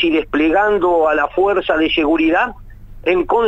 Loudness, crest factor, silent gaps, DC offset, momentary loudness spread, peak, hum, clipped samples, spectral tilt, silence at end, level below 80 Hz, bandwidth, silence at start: -15 LUFS; 12 dB; none; under 0.1%; 4 LU; -4 dBFS; none; under 0.1%; -6 dB/octave; 0 s; -38 dBFS; 7.4 kHz; 0 s